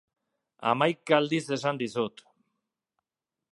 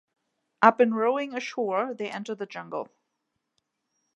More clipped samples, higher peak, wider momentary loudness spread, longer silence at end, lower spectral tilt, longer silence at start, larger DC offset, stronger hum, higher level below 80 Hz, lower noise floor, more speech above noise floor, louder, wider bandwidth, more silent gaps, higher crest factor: neither; second, -6 dBFS vs -2 dBFS; second, 8 LU vs 16 LU; first, 1.45 s vs 1.3 s; about the same, -5 dB/octave vs -5.5 dB/octave; about the same, 0.6 s vs 0.6 s; neither; neither; first, -78 dBFS vs -84 dBFS; first, -90 dBFS vs -80 dBFS; first, 63 dB vs 55 dB; about the same, -28 LUFS vs -26 LUFS; first, 11.5 kHz vs 8.2 kHz; neither; about the same, 24 dB vs 24 dB